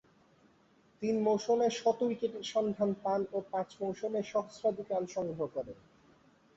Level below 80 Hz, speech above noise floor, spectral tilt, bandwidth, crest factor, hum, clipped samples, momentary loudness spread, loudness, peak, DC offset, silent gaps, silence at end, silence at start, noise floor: -72 dBFS; 33 dB; -5.5 dB/octave; 8 kHz; 16 dB; none; under 0.1%; 8 LU; -34 LUFS; -18 dBFS; under 0.1%; none; 0.85 s; 1 s; -66 dBFS